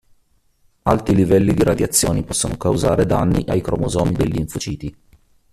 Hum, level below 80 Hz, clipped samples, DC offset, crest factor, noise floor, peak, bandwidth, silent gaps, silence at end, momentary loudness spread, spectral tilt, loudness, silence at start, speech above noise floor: none; -34 dBFS; under 0.1%; under 0.1%; 16 dB; -60 dBFS; -2 dBFS; 14.5 kHz; none; 0.6 s; 10 LU; -5.5 dB/octave; -18 LUFS; 0.85 s; 42 dB